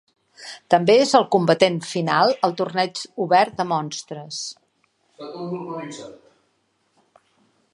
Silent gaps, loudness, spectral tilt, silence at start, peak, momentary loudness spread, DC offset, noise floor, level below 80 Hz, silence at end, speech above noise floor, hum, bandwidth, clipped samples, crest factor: none; -20 LUFS; -4.5 dB/octave; 0.4 s; 0 dBFS; 22 LU; under 0.1%; -68 dBFS; -70 dBFS; 1.6 s; 47 dB; none; 11.5 kHz; under 0.1%; 22 dB